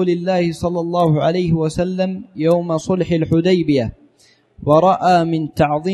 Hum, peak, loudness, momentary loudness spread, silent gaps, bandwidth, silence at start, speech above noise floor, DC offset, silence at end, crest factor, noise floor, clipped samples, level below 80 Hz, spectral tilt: none; 0 dBFS; -17 LUFS; 7 LU; none; 12.5 kHz; 0 s; 38 dB; under 0.1%; 0 s; 16 dB; -54 dBFS; under 0.1%; -44 dBFS; -7.5 dB/octave